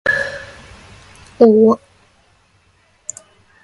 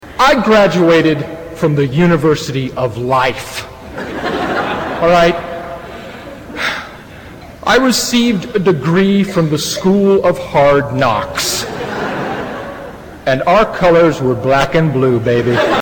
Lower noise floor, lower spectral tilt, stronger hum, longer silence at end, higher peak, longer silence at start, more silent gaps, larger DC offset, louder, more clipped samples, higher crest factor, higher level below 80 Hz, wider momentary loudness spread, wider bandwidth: first, -56 dBFS vs -33 dBFS; about the same, -5.5 dB/octave vs -5 dB/octave; neither; first, 1.85 s vs 0 s; about the same, 0 dBFS vs -2 dBFS; about the same, 0.05 s vs 0.05 s; neither; neither; about the same, -14 LUFS vs -13 LUFS; neither; first, 18 dB vs 12 dB; second, -52 dBFS vs -38 dBFS; first, 22 LU vs 17 LU; second, 11.5 kHz vs 18 kHz